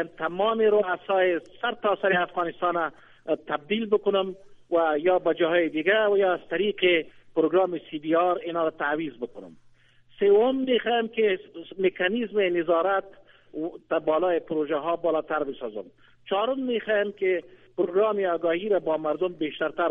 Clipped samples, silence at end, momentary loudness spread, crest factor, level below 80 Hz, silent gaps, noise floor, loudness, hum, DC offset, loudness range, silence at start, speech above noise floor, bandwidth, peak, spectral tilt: under 0.1%; 0 s; 9 LU; 16 dB; -66 dBFS; none; -57 dBFS; -25 LUFS; none; under 0.1%; 4 LU; 0 s; 32 dB; 3.8 kHz; -8 dBFS; -7.5 dB/octave